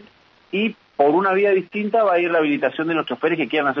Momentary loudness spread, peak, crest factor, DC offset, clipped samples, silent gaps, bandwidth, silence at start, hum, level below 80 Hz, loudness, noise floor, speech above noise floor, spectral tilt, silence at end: 6 LU; -4 dBFS; 16 dB; under 0.1%; under 0.1%; none; 6 kHz; 0.55 s; none; -70 dBFS; -20 LUFS; -52 dBFS; 33 dB; -8 dB/octave; 0 s